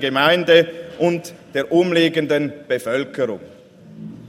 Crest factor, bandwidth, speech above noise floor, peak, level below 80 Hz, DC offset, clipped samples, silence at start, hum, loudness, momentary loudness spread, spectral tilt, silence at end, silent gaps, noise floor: 18 dB; 16 kHz; 21 dB; 0 dBFS; -64 dBFS; under 0.1%; under 0.1%; 0 s; none; -18 LUFS; 13 LU; -5.5 dB/octave; 0 s; none; -39 dBFS